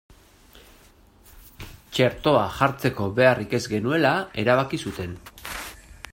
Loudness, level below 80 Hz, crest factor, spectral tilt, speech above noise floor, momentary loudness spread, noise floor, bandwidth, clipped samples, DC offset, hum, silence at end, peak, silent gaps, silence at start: -23 LUFS; -50 dBFS; 22 dB; -5.5 dB/octave; 32 dB; 19 LU; -54 dBFS; 16.5 kHz; under 0.1%; under 0.1%; none; 0.2 s; -4 dBFS; none; 0.55 s